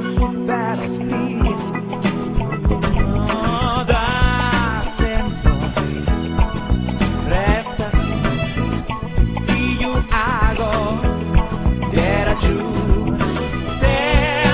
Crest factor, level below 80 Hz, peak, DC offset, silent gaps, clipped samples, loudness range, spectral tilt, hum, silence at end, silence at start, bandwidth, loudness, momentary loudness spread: 16 dB; -22 dBFS; -2 dBFS; under 0.1%; none; under 0.1%; 2 LU; -10.5 dB/octave; none; 0 s; 0 s; 4 kHz; -19 LUFS; 4 LU